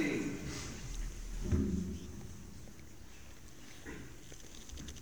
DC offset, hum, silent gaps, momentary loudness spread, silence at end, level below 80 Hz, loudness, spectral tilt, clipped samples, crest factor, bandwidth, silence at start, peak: 0.3%; none; none; 19 LU; 0 s; -48 dBFS; -42 LUFS; -5.5 dB/octave; under 0.1%; 20 dB; over 20 kHz; 0 s; -20 dBFS